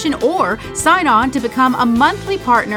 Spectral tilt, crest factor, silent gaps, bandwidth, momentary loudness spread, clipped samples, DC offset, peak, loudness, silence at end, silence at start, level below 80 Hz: -4 dB/octave; 14 dB; none; 18 kHz; 6 LU; under 0.1%; under 0.1%; 0 dBFS; -14 LUFS; 0 s; 0 s; -40 dBFS